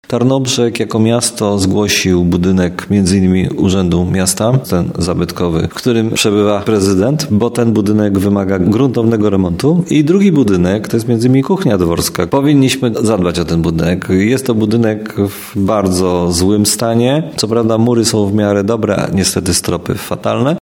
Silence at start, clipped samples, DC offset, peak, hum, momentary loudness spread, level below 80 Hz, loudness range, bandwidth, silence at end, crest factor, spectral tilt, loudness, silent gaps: 0.1 s; under 0.1%; under 0.1%; 0 dBFS; none; 4 LU; -38 dBFS; 2 LU; 18 kHz; 0 s; 12 dB; -5.5 dB/octave; -13 LUFS; none